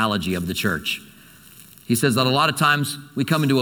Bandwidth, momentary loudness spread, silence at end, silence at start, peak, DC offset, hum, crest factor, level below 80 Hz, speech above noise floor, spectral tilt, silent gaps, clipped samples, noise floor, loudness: 19 kHz; 9 LU; 0 s; 0 s; -4 dBFS; under 0.1%; none; 18 dB; -54 dBFS; 26 dB; -4.5 dB/octave; none; under 0.1%; -47 dBFS; -21 LUFS